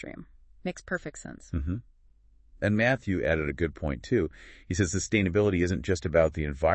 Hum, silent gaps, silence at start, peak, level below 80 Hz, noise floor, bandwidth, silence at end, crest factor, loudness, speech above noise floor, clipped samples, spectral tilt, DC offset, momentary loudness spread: none; none; 0 s; -10 dBFS; -44 dBFS; -59 dBFS; 8.8 kHz; 0 s; 20 dB; -28 LUFS; 31 dB; under 0.1%; -6 dB/octave; under 0.1%; 13 LU